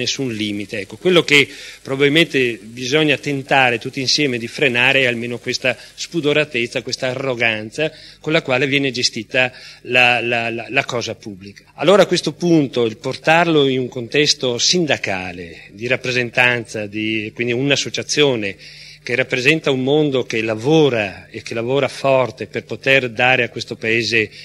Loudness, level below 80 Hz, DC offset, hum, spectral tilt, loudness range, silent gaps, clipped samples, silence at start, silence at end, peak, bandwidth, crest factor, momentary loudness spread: -17 LUFS; -56 dBFS; under 0.1%; none; -4 dB/octave; 3 LU; none; under 0.1%; 0 s; 0 s; 0 dBFS; 15.5 kHz; 18 dB; 12 LU